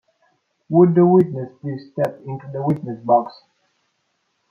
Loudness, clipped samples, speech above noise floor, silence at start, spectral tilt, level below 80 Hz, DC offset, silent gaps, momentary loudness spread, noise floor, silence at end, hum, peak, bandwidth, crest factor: -18 LUFS; under 0.1%; 52 dB; 0.7 s; -10.5 dB/octave; -64 dBFS; under 0.1%; none; 17 LU; -70 dBFS; 1.2 s; none; -2 dBFS; 4.9 kHz; 18 dB